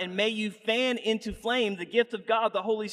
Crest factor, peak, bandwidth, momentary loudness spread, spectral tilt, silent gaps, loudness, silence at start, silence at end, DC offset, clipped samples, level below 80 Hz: 16 dB; -12 dBFS; 13 kHz; 4 LU; -4 dB/octave; none; -28 LUFS; 0 s; 0 s; under 0.1%; under 0.1%; -56 dBFS